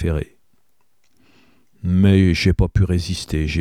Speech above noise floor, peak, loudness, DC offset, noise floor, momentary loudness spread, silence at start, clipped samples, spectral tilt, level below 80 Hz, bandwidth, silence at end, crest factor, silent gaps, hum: 51 dB; -2 dBFS; -18 LUFS; 0.2%; -68 dBFS; 12 LU; 0 s; under 0.1%; -7 dB/octave; -30 dBFS; 12.5 kHz; 0 s; 16 dB; none; none